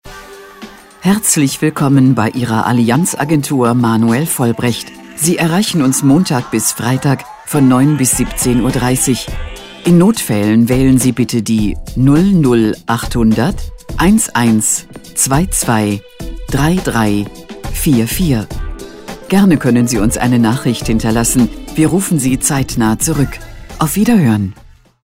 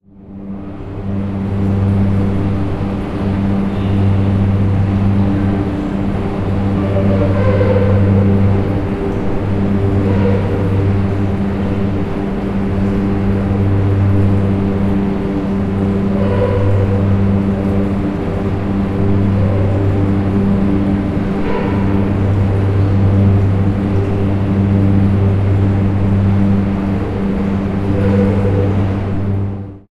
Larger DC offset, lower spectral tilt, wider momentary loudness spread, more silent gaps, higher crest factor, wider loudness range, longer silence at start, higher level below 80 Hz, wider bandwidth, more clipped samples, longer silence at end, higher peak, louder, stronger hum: first, 0.1% vs under 0.1%; second, -5 dB/octave vs -10 dB/octave; first, 13 LU vs 6 LU; neither; about the same, 12 dB vs 12 dB; about the same, 2 LU vs 2 LU; second, 0.05 s vs 0.2 s; about the same, -28 dBFS vs -28 dBFS; first, 16.5 kHz vs 5.2 kHz; neither; first, 0.5 s vs 0.2 s; about the same, 0 dBFS vs 0 dBFS; about the same, -13 LUFS vs -15 LUFS; neither